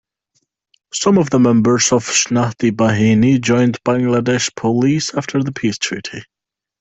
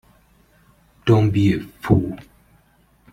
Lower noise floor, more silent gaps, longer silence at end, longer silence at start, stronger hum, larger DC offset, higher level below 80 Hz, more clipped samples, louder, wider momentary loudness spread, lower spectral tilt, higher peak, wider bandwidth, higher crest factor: first, -67 dBFS vs -57 dBFS; neither; second, 0.6 s vs 0.9 s; about the same, 0.95 s vs 1.05 s; neither; neither; second, -50 dBFS vs -44 dBFS; neither; first, -15 LUFS vs -19 LUFS; second, 8 LU vs 12 LU; second, -4.5 dB/octave vs -8.5 dB/octave; about the same, -2 dBFS vs -2 dBFS; second, 8.4 kHz vs 11.5 kHz; second, 14 dB vs 20 dB